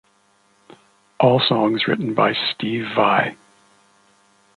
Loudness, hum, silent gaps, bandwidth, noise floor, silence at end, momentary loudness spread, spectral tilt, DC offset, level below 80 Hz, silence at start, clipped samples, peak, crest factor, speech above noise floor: -19 LUFS; none; none; 11 kHz; -60 dBFS; 1.25 s; 6 LU; -7 dB/octave; under 0.1%; -64 dBFS; 1.2 s; under 0.1%; -2 dBFS; 20 dB; 41 dB